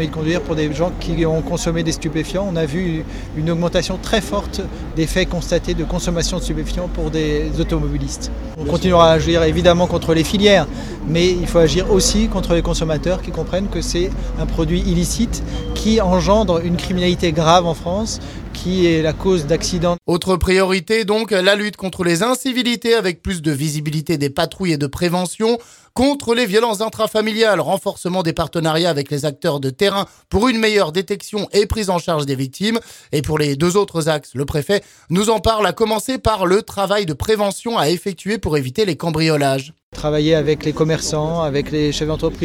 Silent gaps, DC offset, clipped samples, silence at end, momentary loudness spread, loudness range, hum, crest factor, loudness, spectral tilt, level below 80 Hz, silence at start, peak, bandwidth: 39.83-39.92 s; under 0.1%; under 0.1%; 0 s; 8 LU; 5 LU; none; 18 dB; -18 LUFS; -5 dB/octave; -30 dBFS; 0 s; 0 dBFS; 17 kHz